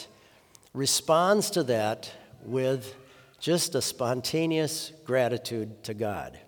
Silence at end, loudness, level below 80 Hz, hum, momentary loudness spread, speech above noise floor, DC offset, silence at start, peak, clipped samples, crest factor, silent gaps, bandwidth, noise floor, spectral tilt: 0.1 s; -28 LUFS; -68 dBFS; none; 14 LU; 30 dB; under 0.1%; 0 s; -8 dBFS; under 0.1%; 20 dB; none; over 20 kHz; -57 dBFS; -4 dB/octave